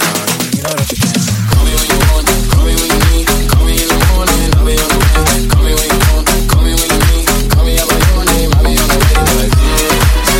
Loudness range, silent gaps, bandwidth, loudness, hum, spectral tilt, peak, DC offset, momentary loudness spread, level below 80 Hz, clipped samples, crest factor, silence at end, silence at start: 1 LU; none; 17 kHz; -11 LUFS; none; -4 dB/octave; 0 dBFS; under 0.1%; 3 LU; -12 dBFS; under 0.1%; 10 dB; 0 s; 0 s